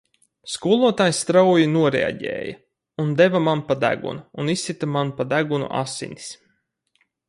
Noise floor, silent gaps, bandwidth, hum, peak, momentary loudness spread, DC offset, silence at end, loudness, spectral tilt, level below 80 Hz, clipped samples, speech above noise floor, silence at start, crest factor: -69 dBFS; none; 11.5 kHz; none; -2 dBFS; 15 LU; under 0.1%; 0.95 s; -21 LUFS; -5 dB/octave; -60 dBFS; under 0.1%; 49 dB; 0.45 s; 18 dB